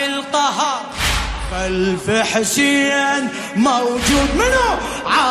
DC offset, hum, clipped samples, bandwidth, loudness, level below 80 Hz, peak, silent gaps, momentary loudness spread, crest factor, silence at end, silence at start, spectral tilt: under 0.1%; none; under 0.1%; 15.5 kHz; -17 LUFS; -30 dBFS; -4 dBFS; none; 7 LU; 14 dB; 0 s; 0 s; -3 dB/octave